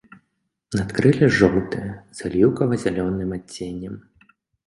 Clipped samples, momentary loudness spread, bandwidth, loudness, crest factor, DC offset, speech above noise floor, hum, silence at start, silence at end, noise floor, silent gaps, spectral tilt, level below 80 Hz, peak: under 0.1%; 16 LU; 11.5 kHz; -21 LUFS; 22 dB; under 0.1%; 54 dB; none; 0.7 s; 0.65 s; -74 dBFS; none; -7 dB/octave; -46 dBFS; 0 dBFS